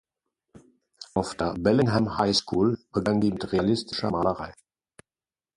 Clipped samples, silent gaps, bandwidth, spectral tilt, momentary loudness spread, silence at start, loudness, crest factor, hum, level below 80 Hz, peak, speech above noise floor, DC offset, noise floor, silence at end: under 0.1%; none; 11.5 kHz; -6 dB/octave; 8 LU; 1 s; -25 LUFS; 18 dB; none; -50 dBFS; -8 dBFS; over 65 dB; under 0.1%; under -90 dBFS; 1.05 s